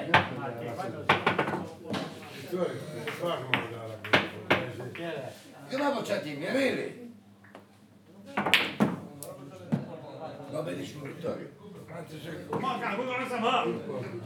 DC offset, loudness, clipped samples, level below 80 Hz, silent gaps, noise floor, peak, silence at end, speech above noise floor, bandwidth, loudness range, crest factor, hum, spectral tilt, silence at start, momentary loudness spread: under 0.1%; -31 LUFS; under 0.1%; -80 dBFS; none; -56 dBFS; -4 dBFS; 0 s; 24 dB; 20 kHz; 6 LU; 28 dB; none; -5 dB/octave; 0 s; 17 LU